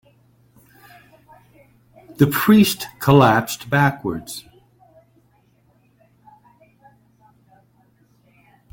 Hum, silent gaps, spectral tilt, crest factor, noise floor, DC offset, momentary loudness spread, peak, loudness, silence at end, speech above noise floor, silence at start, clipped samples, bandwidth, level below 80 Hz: none; none; -6 dB/octave; 22 dB; -59 dBFS; under 0.1%; 16 LU; -2 dBFS; -17 LUFS; 4.35 s; 42 dB; 2.2 s; under 0.1%; 17 kHz; -54 dBFS